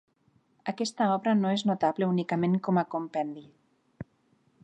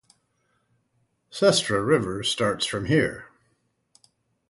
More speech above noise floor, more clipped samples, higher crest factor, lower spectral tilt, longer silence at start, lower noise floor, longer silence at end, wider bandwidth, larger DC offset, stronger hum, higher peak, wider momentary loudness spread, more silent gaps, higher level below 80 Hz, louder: second, 41 dB vs 48 dB; neither; second, 16 dB vs 22 dB; first, -6.5 dB/octave vs -4 dB/octave; second, 0.65 s vs 1.35 s; about the same, -68 dBFS vs -71 dBFS; second, 0.6 s vs 1.25 s; second, 9.2 kHz vs 11.5 kHz; neither; neither; second, -14 dBFS vs -4 dBFS; first, 21 LU vs 8 LU; neither; second, -72 dBFS vs -56 dBFS; second, -28 LUFS vs -23 LUFS